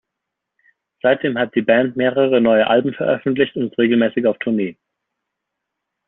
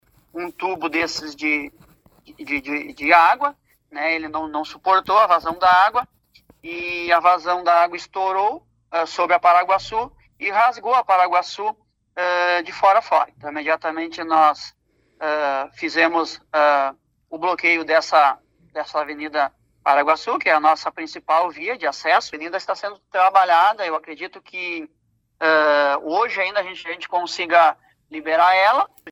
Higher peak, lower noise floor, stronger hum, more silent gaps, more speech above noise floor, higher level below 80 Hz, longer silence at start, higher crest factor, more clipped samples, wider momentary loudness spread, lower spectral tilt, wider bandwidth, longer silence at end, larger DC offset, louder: about the same, -2 dBFS vs 0 dBFS; first, -80 dBFS vs -53 dBFS; neither; neither; first, 64 dB vs 34 dB; about the same, -62 dBFS vs -62 dBFS; first, 1.05 s vs 0.35 s; about the same, 16 dB vs 20 dB; neither; second, 6 LU vs 14 LU; about the same, -4 dB/octave vs -3 dB/octave; second, 4 kHz vs 14.5 kHz; first, 1.35 s vs 0 s; neither; about the same, -17 LUFS vs -19 LUFS